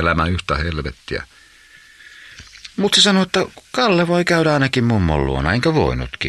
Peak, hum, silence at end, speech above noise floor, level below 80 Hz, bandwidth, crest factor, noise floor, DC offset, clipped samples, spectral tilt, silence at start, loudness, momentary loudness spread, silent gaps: 0 dBFS; none; 0 s; 29 dB; -34 dBFS; 13 kHz; 18 dB; -47 dBFS; under 0.1%; under 0.1%; -4.5 dB/octave; 0 s; -17 LUFS; 15 LU; none